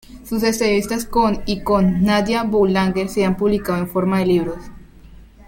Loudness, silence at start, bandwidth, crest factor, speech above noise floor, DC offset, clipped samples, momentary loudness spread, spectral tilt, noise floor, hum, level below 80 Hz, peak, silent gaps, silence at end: -18 LUFS; 0.1 s; 16.5 kHz; 16 dB; 25 dB; under 0.1%; under 0.1%; 5 LU; -6 dB/octave; -42 dBFS; none; -38 dBFS; -4 dBFS; none; 0.05 s